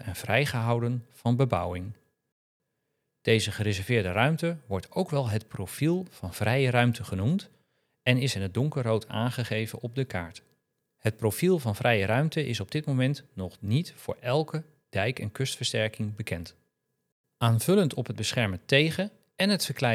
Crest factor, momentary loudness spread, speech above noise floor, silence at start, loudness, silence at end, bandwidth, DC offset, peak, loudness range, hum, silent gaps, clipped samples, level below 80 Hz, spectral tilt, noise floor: 24 dB; 11 LU; 52 dB; 0 s; -28 LUFS; 0 s; 16 kHz; under 0.1%; -6 dBFS; 3 LU; none; 2.32-2.60 s, 17.12-17.24 s; under 0.1%; -66 dBFS; -5.5 dB/octave; -80 dBFS